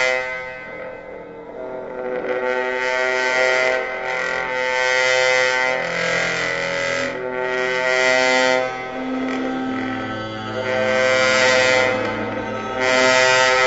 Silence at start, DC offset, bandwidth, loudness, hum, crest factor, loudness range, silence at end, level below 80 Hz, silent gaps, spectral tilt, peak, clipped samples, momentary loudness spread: 0 s; under 0.1%; 8 kHz; -18 LUFS; none; 16 dB; 3 LU; 0 s; -52 dBFS; none; -2.5 dB/octave; -4 dBFS; under 0.1%; 14 LU